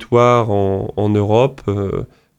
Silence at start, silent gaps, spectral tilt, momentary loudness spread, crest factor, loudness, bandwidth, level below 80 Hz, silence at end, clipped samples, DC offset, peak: 0 s; none; -8 dB/octave; 9 LU; 14 dB; -16 LUFS; 8.6 kHz; -44 dBFS; 0.35 s; under 0.1%; under 0.1%; -2 dBFS